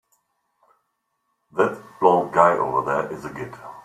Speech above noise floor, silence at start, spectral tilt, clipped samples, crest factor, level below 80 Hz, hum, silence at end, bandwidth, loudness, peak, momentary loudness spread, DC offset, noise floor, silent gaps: 53 dB; 1.55 s; -6.5 dB/octave; under 0.1%; 22 dB; -62 dBFS; none; 0.05 s; 14 kHz; -21 LUFS; -2 dBFS; 16 LU; under 0.1%; -74 dBFS; none